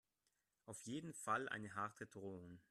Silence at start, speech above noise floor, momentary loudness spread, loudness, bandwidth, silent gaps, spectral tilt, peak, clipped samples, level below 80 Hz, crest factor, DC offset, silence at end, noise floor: 0.65 s; 40 dB; 14 LU; -48 LUFS; 14.5 kHz; none; -4 dB/octave; -28 dBFS; under 0.1%; -84 dBFS; 22 dB; under 0.1%; 0.1 s; -88 dBFS